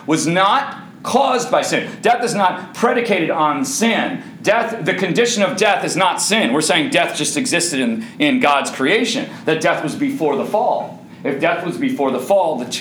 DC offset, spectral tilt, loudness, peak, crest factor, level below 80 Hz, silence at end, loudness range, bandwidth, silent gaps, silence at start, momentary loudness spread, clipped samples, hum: under 0.1%; -3.5 dB/octave; -17 LUFS; 0 dBFS; 16 dB; -68 dBFS; 0 s; 3 LU; over 20 kHz; none; 0 s; 6 LU; under 0.1%; none